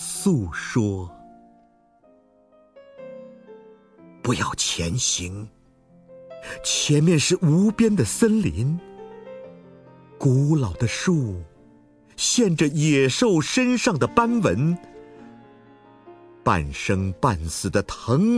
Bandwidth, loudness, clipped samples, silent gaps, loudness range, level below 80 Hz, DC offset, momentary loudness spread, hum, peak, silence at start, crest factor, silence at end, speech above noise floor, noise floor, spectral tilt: 11 kHz; -22 LUFS; under 0.1%; none; 8 LU; -46 dBFS; under 0.1%; 21 LU; none; -4 dBFS; 0 s; 20 dB; 0 s; 37 dB; -57 dBFS; -5 dB/octave